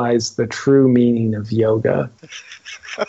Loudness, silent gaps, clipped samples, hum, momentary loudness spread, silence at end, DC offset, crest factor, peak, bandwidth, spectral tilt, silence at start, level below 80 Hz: -17 LUFS; none; under 0.1%; none; 21 LU; 0.05 s; under 0.1%; 14 dB; -4 dBFS; 8 kHz; -6.5 dB/octave; 0 s; -56 dBFS